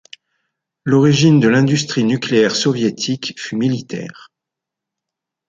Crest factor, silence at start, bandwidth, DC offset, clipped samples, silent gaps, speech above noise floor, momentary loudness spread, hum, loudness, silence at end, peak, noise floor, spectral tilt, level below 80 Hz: 16 dB; 0.85 s; 9 kHz; under 0.1%; under 0.1%; none; 68 dB; 14 LU; none; -15 LUFS; 1.35 s; -2 dBFS; -83 dBFS; -5.5 dB/octave; -56 dBFS